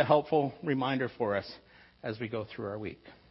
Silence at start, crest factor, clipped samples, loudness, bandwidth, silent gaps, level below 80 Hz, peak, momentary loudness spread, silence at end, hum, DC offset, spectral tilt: 0 s; 22 dB; under 0.1%; -32 LUFS; 5.8 kHz; none; -66 dBFS; -10 dBFS; 16 LU; 0.15 s; none; under 0.1%; -10 dB/octave